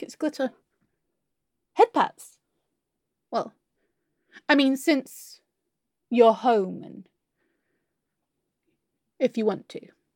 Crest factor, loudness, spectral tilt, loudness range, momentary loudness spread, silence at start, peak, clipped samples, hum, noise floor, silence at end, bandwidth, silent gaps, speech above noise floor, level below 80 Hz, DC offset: 22 dB; -24 LUFS; -4.5 dB/octave; 6 LU; 21 LU; 0 s; -4 dBFS; under 0.1%; none; -82 dBFS; 0.35 s; 17.5 kHz; none; 59 dB; -84 dBFS; under 0.1%